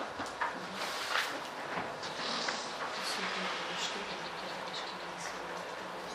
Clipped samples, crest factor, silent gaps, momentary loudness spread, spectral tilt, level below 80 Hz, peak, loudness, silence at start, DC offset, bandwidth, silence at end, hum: under 0.1%; 22 dB; none; 7 LU; -2 dB/octave; -72 dBFS; -18 dBFS; -37 LUFS; 0 s; under 0.1%; 15.5 kHz; 0 s; none